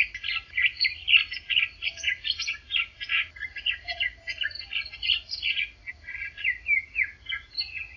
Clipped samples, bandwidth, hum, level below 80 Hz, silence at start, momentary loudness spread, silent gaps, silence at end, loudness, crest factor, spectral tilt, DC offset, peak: under 0.1%; 7.4 kHz; none; -54 dBFS; 0 s; 10 LU; none; 0 s; -26 LUFS; 22 dB; 1 dB/octave; under 0.1%; -6 dBFS